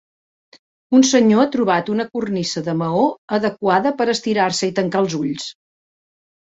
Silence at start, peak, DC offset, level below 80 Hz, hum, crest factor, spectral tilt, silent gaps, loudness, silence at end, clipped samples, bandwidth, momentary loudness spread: 0.9 s; -2 dBFS; under 0.1%; -60 dBFS; none; 18 dB; -4.5 dB/octave; 3.18-3.28 s; -18 LUFS; 0.95 s; under 0.1%; 8 kHz; 9 LU